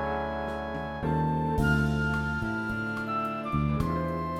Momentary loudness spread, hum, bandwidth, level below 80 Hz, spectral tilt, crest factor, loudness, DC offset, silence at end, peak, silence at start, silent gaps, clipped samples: 7 LU; none; 15 kHz; -40 dBFS; -7.5 dB/octave; 16 dB; -29 LUFS; under 0.1%; 0 s; -14 dBFS; 0 s; none; under 0.1%